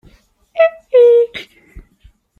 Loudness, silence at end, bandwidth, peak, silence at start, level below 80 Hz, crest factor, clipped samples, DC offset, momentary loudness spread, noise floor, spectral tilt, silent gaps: -12 LUFS; 0.6 s; 5.2 kHz; -2 dBFS; 0.55 s; -48 dBFS; 14 dB; under 0.1%; under 0.1%; 18 LU; -49 dBFS; -4 dB/octave; none